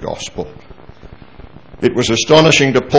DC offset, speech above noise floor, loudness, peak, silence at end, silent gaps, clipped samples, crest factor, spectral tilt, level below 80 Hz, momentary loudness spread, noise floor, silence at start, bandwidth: 0.9%; 26 dB; -12 LUFS; 0 dBFS; 0 s; none; 0.2%; 14 dB; -4 dB/octave; -40 dBFS; 18 LU; -38 dBFS; 0 s; 8 kHz